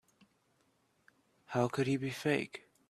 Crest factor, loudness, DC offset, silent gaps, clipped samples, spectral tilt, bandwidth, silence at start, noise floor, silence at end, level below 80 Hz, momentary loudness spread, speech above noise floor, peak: 22 dB; -35 LUFS; under 0.1%; none; under 0.1%; -6 dB/octave; 14.5 kHz; 1.5 s; -74 dBFS; 0.3 s; -74 dBFS; 6 LU; 41 dB; -16 dBFS